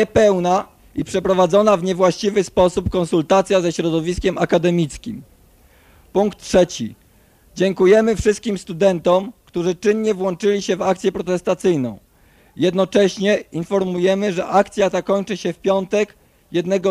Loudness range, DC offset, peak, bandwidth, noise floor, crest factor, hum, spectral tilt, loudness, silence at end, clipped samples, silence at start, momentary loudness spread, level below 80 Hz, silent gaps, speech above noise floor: 3 LU; under 0.1%; -2 dBFS; 14.5 kHz; -53 dBFS; 16 dB; none; -5.5 dB/octave; -18 LUFS; 0 s; under 0.1%; 0 s; 9 LU; -42 dBFS; none; 35 dB